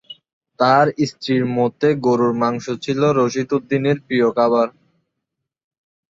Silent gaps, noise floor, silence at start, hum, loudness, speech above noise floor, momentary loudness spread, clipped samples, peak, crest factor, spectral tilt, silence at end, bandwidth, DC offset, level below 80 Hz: 0.33-0.41 s; -80 dBFS; 0.1 s; none; -18 LUFS; 62 dB; 6 LU; under 0.1%; -2 dBFS; 16 dB; -6.5 dB/octave; 1.4 s; 7.8 kHz; under 0.1%; -62 dBFS